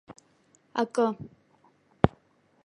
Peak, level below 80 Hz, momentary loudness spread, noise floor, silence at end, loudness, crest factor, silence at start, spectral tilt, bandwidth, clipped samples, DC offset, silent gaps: 0 dBFS; -50 dBFS; 14 LU; -65 dBFS; 0.6 s; -28 LUFS; 30 dB; 0.1 s; -7 dB/octave; 11 kHz; under 0.1%; under 0.1%; none